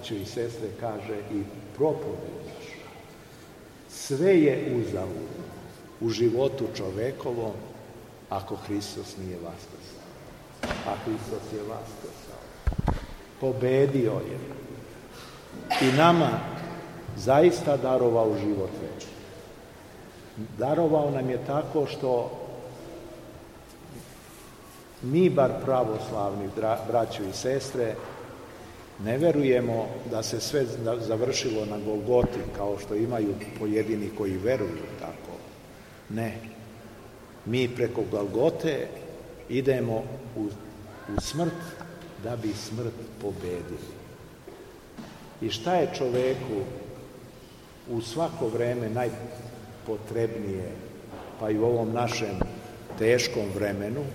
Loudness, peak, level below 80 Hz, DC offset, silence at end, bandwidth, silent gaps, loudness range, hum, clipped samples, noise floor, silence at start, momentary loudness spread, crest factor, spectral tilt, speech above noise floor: -28 LUFS; -6 dBFS; -48 dBFS; under 0.1%; 0 s; 16 kHz; none; 9 LU; none; under 0.1%; -48 dBFS; 0 s; 22 LU; 24 dB; -6 dB/octave; 21 dB